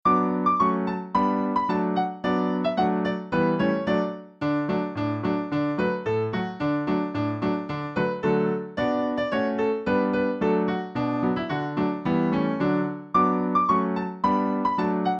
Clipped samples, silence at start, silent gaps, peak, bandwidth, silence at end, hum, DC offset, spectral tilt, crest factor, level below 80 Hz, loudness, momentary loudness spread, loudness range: under 0.1%; 0.05 s; none; -10 dBFS; 7.2 kHz; 0 s; none; under 0.1%; -8.5 dB/octave; 14 dB; -56 dBFS; -25 LUFS; 5 LU; 2 LU